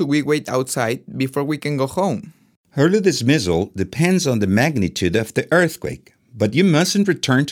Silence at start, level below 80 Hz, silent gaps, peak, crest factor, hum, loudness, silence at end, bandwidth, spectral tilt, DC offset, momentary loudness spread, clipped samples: 0 s; -54 dBFS; 2.56-2.64 s; -2 dBFS; 16 dB; none; -19 LUFS; 0 s; 17.5 kHz; -5.5 dB/octave; under 0.1%; 8 LU; under 0.1%